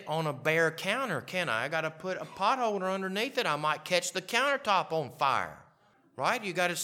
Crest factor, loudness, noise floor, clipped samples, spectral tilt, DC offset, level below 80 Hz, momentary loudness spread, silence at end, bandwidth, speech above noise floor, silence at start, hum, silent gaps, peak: 22 dB; -30 LUFS; -65 dBFS; under 0.1%; -3.5 dB/octave; under 0.1%; -78 dBFS; 6 LU; 0 s; 17 kHz; 34 dB; 0 s; none; none; -10 dBFS